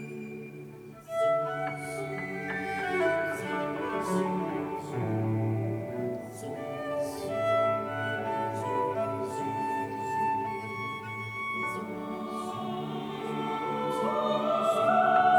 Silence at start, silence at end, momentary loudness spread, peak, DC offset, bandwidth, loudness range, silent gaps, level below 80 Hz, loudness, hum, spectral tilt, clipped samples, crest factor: 0 s; 0 s; 9 LU; -12 dBFS; under 0.1%; 19.5 kHz; 3 LU; none; -68 dBFS; -31 LUFS; none; -6 dB/octave; under 0.1%; 18 dB